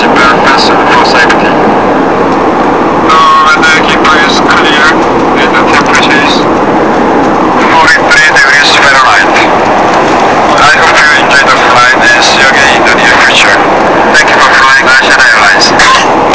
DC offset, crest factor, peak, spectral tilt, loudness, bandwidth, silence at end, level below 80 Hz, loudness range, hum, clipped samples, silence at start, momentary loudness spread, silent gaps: under 0.1%; 4 dB; 0 dBFS; -3 dB/octave; -3 LUFS; 8 kHz; 0 s; -32 dBFS; 2 LU; none; 3%; 0 s; 5 LU; none